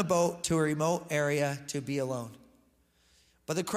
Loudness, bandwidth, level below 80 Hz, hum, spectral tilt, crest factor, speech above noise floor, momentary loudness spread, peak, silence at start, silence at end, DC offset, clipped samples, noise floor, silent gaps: -31 LUFS; 16 kHz; -64 dBFS; none; -5 dB/octave; 18 dB; 38 dB; 10 LU; -14 dBFS; 0 s; 0 s; under 0.1%; under 0.1%; -68 dBFS; none